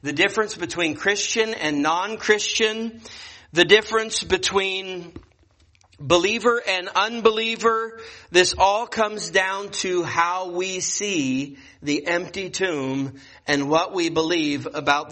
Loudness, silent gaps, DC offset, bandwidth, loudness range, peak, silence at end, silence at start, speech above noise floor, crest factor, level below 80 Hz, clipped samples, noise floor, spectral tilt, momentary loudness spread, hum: -21 LUFS; none; under 0.1%; 8.8 kHz; 4 LU; -2 dBFS; 0 s; 0.05 s; 36 dB; 22 dB; -54 dBFS; under 0.1%; -58 dBFS; -2.5 dB/octave; 11 LU; none